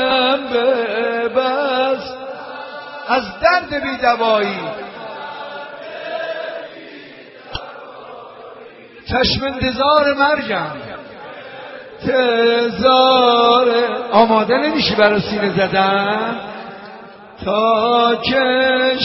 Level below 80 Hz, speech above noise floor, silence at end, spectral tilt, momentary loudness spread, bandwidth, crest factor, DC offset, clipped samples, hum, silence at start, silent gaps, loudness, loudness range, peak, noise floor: -46 dBFS; 24 dB; 0 s; -2 dB/octave; 21 LU; 6 kHz; 18 dB; under 0.1%; under 0.1%; none; 0 s; none; -15 LUFS; 15 LU; 0 dBFS; -39 dBFS